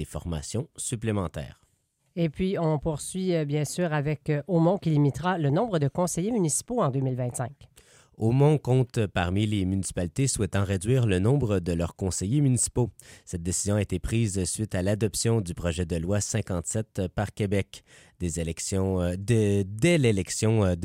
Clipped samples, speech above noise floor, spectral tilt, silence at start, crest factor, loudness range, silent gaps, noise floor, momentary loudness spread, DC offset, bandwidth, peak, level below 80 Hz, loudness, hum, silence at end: under 0.1%; 45 dB; -5.5 dB/octave; 0 s; 16 dB; 4 LU; none; -71 dBFS; 8 LU; under 0.1%; 16 kHz; -10 dBFS; -46 dBFS; -27 LUFS; none; 0 s